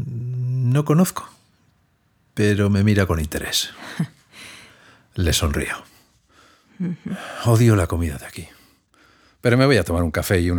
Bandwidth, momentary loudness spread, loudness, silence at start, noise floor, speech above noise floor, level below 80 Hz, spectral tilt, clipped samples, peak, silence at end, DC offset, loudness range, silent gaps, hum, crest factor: over 20 kHz; 18 LU; -20 LUFS; 0 s; -63 dBFS; 43 dB; -38 dBFS; -5.5 dB/octave; under 0.1%; -2 dBFS; 0 s; under 0.1%; 6 LU; none; none; 20 dB